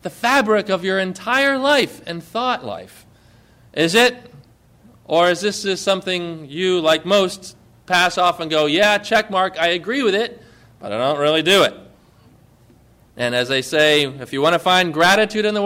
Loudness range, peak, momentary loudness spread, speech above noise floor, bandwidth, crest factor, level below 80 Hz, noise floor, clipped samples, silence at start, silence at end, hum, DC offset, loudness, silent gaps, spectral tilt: 3 LU; -4 dBFS; 10 LU; 33 dB; 16 kHz; 16 dB; -58 dBFS; -51 dBFS; under 0.1%; 0.05 s; 0 s; none; under 0.1%; -17 LUFS; none; -3.5 dB/octave